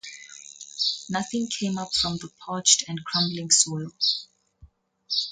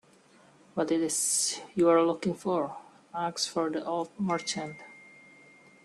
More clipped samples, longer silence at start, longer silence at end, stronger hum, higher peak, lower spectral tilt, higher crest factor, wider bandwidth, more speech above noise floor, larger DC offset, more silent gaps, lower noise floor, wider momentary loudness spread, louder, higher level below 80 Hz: neither; second, 0.05 s vs 0.75 s; second, 0 s vs 0.75 s; neither; first, -4 dBFS vs -12 dBFS; second, -2 dB/octave vs -3.5 dB/octave; first, 24 dB vs 18 dB; second, 11 kHz vs 13 kHz; about the same, 30 dB vs 31 dB; neither; neither; second, -55 dBFS vs -59 dBFS; about the same, 18 LU vs 16 LU; first, -23 LUFS vs -29 LUFS; first, -60 dBFS vs -74 dBFS